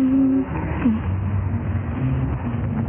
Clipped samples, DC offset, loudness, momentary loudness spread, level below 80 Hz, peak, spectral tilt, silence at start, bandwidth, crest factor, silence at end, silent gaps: under 0.1%; under 0.1%; -22 LUFS; 6 LU; -34 dBFS; -8 dBFS; -9.5 dB/octave; 0 s; 3.3 kHz; 12 dB; 0 s; none